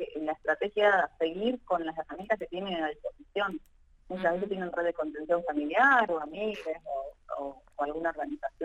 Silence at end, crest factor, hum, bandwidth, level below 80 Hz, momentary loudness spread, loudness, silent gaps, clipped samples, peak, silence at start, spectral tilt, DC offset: 0 s; 20 dB; none; 9 kHz; -60 dBFS; 14 LU; -30 LUFS; none; under 0.1%; -10 dBFS; 0 s; -6 dB/octave; under 0.1%